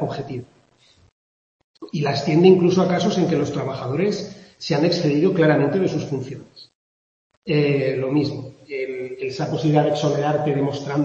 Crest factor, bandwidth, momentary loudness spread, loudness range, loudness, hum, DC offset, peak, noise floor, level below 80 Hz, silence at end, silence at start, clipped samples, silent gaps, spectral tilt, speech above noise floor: 18 dB; 7.6 kHz; 15 LU; 5 LU; -20 LUFS; none; under 0.1%; -2 dBFS; -57 dBFS; -60 dBFS; 0 s; 0 s; under 0.1%; 1.12-1.74 s, 6.75-7.30 s, 7.37-7.42 s; -7 dB/octave; 37 dB